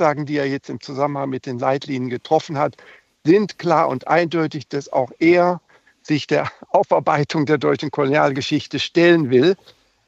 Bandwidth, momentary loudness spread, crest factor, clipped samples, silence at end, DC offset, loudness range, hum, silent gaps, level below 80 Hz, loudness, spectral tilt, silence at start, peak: 8 kHz; 10 LU; 18 dB; under 0.1%; 0.55 s; under 0.1%; 4 LU; none; none; -66 dBFS; -19 LUFS; -6.5 dB/octave; 0 s; -2 dBFS